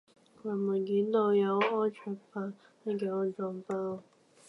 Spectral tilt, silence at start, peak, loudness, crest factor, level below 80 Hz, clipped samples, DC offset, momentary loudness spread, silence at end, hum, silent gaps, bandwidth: -7.5 dB/octave; 0.45 s; -16 dBFS; -32 LUFS; 16 dB; -86 dBFS; under 0.1%; under 0.1%; 15 LU; 0.45 s; none; none; 10.5 kHz